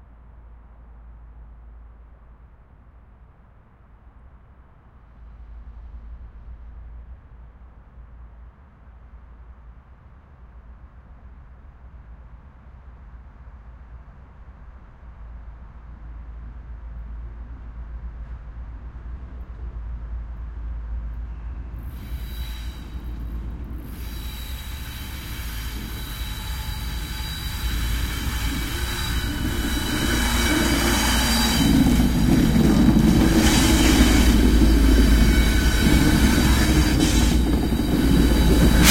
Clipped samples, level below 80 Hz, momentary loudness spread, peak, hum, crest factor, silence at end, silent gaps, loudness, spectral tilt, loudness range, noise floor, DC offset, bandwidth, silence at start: under 0.1%; -26 dBFS; 25 LU; -2 dBFS; none; 22 dB; 0 s; none; -20 LUFS; -5 dB/octave; 26 LU; -50 dBFS; under 0.1%; 16.5 kHz; 0 s